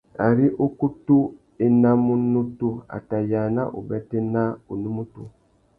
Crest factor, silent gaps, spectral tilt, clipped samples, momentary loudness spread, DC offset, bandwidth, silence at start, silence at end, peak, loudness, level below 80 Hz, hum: 18 dB; none; -12.5 dB/octave; under 0.1%; 12 LU; under 0.1%; 2.8 kHz; 0.2 s; 0.5 s; -4 dBFS; -22 LUFS; -54 dBFS; none